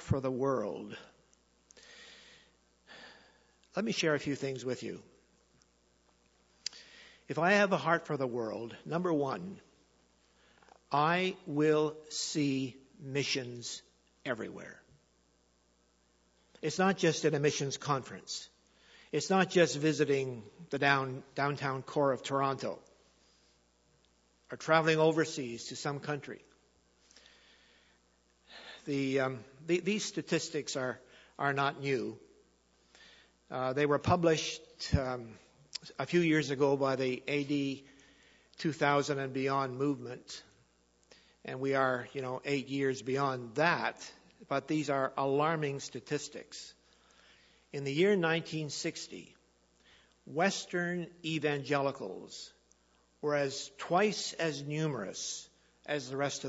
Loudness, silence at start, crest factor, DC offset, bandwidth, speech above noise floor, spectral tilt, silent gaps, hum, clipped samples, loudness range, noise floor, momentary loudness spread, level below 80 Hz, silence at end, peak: -33 LUFS; 0 s; 24 dB; under 0.1%; 8 kHz; 38 dB; -4.5 dB/octave; none; none; under 0.1%; 7 LU; -71 dBFS; 18 LU; -62 dBFS; 0 s; -10 dBFS